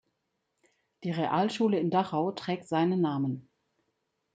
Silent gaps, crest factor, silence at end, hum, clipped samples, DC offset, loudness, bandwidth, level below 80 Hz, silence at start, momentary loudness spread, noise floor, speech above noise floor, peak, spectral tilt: none; 18 dB; 0.95 s; none; under 0.1%; under 0.1%; -29 LUFS; 9.2 kHz; -76 dBFS; 1 s; 8 LU; -80 dBFS; 52 dB; -12 dBFS; -7 dB/octave